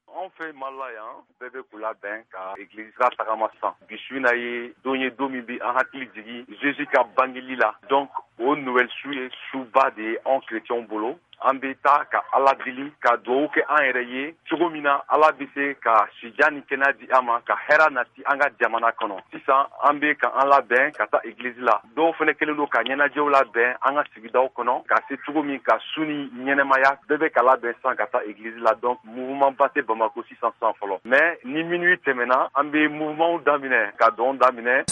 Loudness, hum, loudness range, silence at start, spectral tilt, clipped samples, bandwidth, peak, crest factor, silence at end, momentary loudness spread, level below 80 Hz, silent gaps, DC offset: -22 LUFS; none; 5 LU; 0.15 s; -4 dB/octave; under 0.1%; 9.6 kHz; -4 dBFS; 18 dB; 0 s; 13 LU; -76 dBFS; none; under 0.1%